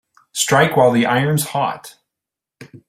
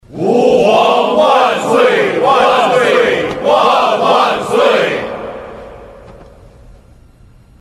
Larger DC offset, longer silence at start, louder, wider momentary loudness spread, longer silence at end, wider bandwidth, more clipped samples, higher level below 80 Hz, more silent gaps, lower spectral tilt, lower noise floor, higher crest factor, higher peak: neither; first, 0.35 s vs 0.1 s; second, -16 LUFS vs -11 LUFS; about the same, 12 LU vs 12 LU; second, 0.1 s vs 1.45 s; first, 16 kHz vs 13.5 kHz; neither; second, -56 dBFS vs -46 dBFS; neither; about the same, -4.5 dB/octave vs -4.5 dB/octave; first, -85 dBFS vs -42 dBFS; first, 18 dB vs 12 dB; about the same, 0 dBFS vs 0 dBFS